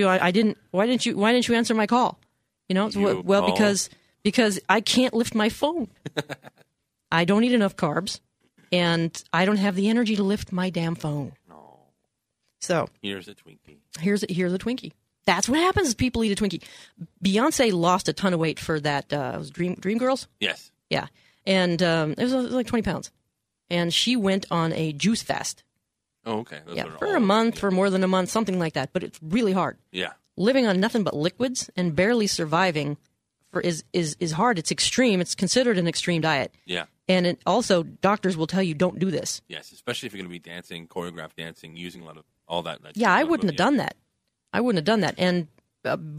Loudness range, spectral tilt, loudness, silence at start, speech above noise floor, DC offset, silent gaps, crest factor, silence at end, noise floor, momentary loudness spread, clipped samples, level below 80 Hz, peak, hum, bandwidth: 6 LU; -4.5 dB/octave; -24 LUFS; 0 s; 56 dB; under 0.1%; none; 20 dB; 0 s; -79 dBFS; 13 LU; under 0.1%; -54 dBFS; -4 dBFS; none; 15 kHz